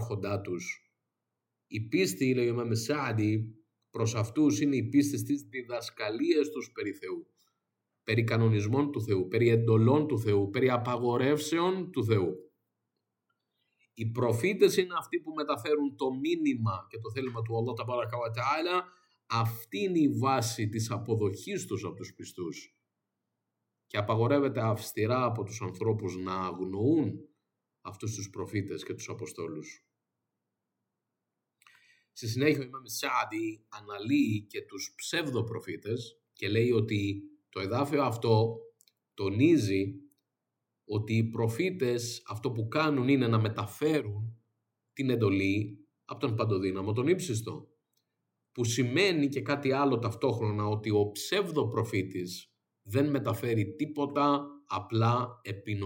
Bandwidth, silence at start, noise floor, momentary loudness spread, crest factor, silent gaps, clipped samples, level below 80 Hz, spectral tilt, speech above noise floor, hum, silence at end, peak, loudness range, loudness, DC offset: 17.5 kHz; 0 s; -86 dBFS; 13 LU; 20 dB; none; under 0.1%; -74 dBFS; -6 dB/octave; 57 dB; none; 0 s; -10 dBFS; 6 LU; -30 LUFS; under 0.1%